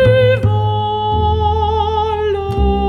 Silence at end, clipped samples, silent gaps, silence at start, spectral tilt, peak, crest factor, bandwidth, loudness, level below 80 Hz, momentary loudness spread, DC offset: 0 s; under 0.1%; none; 0 s; -8 dB/octave; -2 dBFS; 12 dB; 6.2 kHz; -15 LUFS; -24 dBFS; 5 LU; under 0.1%